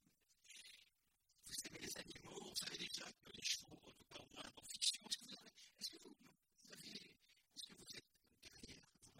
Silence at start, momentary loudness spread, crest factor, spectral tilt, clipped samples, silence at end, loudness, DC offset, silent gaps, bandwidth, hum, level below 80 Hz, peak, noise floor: 0.3 s; 19 LU; 28 dB; -0.5 dB/octave; under 0.1%; 0 s; -49 LUFS; under 0.1%; none; 16.5 kHz; none; -80 dBFS; -26 dBFS; -83 dBFS